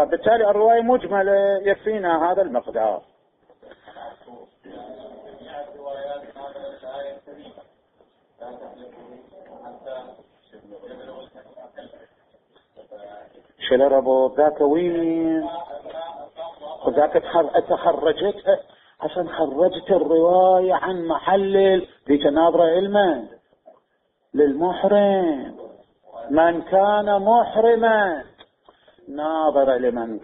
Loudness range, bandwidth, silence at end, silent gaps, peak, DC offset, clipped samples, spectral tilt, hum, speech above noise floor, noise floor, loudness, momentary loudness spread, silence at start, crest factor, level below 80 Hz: 22 LU; 4 kHz; 0.05 s; none; -4 dBFS; under 0.1%; under 0.1%; -10 dB/octave; none; 49 dB; -69 dBFS; -19 LUFS; 23 LU; 0 s; 18 dB; -58 dBFS